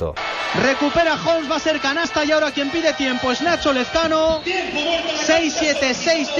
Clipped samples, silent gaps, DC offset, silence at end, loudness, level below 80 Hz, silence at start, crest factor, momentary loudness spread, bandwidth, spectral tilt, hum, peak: under 0.1%; none; under 0.1%; 0 s; -18 LUFS; -44 dBFS; 0 s; 12 dB; 3 LU; 8 kHz; -3 dB/octave; none; -6 dBFS